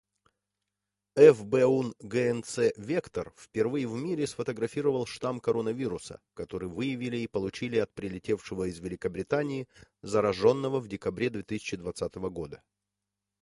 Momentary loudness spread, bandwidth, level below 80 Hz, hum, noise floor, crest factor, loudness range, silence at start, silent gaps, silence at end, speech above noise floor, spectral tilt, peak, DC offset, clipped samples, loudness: 13 LU; 11.5 kHz; -60 dBFS; 50 Hz at -65 dBFS; -87 dBFS; 22 dB; 7 LU; 1.15 s; none; 0.85 s; 58 dB; -6 dB/octave; -6 dBFS; under 0.1%; under 0.1%; -29 LUFS